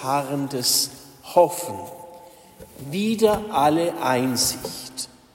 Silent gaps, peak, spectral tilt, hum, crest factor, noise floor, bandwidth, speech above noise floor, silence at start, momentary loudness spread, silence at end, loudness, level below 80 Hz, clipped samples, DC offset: none; -4 dBFS; -3.5 dB/octave; none; 20 dB; -46 dBFS; 16.5 kHz; 24 dB; 0 s; 15 LU; 0.3 s; -22 LUFS; -54 dBFS; under 0.1%; under 0.1%